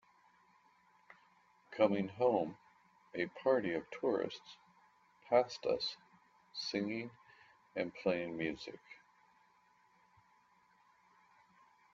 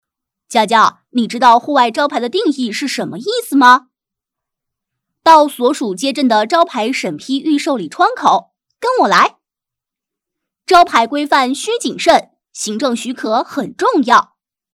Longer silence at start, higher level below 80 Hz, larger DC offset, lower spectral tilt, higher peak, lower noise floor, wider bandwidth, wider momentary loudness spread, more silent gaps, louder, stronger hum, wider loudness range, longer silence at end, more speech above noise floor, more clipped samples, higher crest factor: first, 1.7 s vs 0.5 s; second, -78 dBFS vs -58 dBFS; neither; about the same, -3.5 dB/octave vs -3 dB/octave; second, -16 dBFS vs 0 dBFS; second, -71 dBFS vs -84 dBFS; second, 7.6 kHz vs 16 kHz; first, 20 LU vs 10 LU; neither; second, -37 LUFS vs -13 LUFS; first, 60 Hz at -70 dBFS vs none; first, 7 LU vs 2 LU; first, 3 s vs 0.5 s; second, 34 dB vs 72 dB; second, under 0.1% vs 0.4%; first, 24 dB vs 14 dB